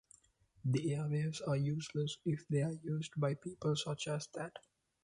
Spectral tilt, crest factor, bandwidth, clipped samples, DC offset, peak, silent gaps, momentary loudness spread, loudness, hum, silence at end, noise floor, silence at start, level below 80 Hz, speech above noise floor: -6 dB/octave; 14 dB; 11 kHz; under 0.1%; under 0.1%; -24 dBFS; none; 7 LU; -38 LUFS; none; 0.45 s; -69 dBFS; 0.65 s; -72 dBFS; 31 dB